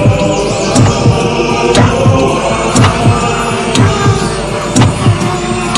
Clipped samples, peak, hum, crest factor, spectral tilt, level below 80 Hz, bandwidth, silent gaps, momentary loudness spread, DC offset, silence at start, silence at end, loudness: under 0.1%; 0 dBFS; none; 10 dB; -5.5 dB/octave; -26 dBFS; 11.5 kHz; none; 5 LU; under 0.1%; 0 s; 0 s; -10 LUFS